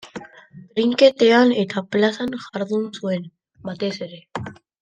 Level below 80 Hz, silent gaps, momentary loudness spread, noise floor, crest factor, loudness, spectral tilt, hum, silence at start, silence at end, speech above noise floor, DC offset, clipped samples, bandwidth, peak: -66 dBFS; none; 20 LU; -45 dBFS; 20 dB; -20 LUFS; -5.5 dB/octave; none; 0.05 s; 0.3 s; 25 dB; under 0.1%; under 0.1%; 9.2 kHz; 0 dBFS